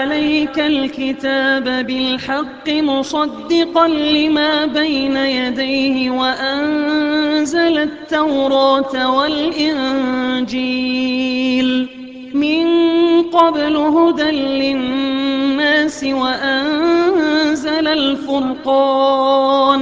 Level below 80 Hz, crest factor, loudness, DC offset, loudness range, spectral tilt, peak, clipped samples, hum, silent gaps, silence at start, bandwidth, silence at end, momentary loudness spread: -50 dBFS; 14 dB; -15 LUFS; under 0.1%; 2 LU; -4 dB/octave; 0 dBFS; under 0.1%; none; none; 0 s; 7.8 kHz; 0 s; 5 LU